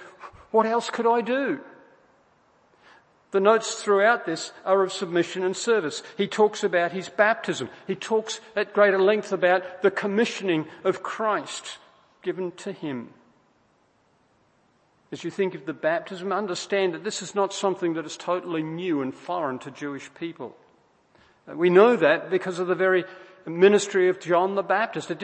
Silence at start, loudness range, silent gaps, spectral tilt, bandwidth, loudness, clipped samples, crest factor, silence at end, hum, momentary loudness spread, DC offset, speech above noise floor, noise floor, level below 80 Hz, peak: 0 s; 10 LU; none; -4.5 dB/octave; 8.8 kHz; -24 LUFS; under 0.1%; 22 dB; 0 s; none; 15 LU; under 0.1%; 40 dB; -64 dBFS; -74 dBFS; -2 dBFS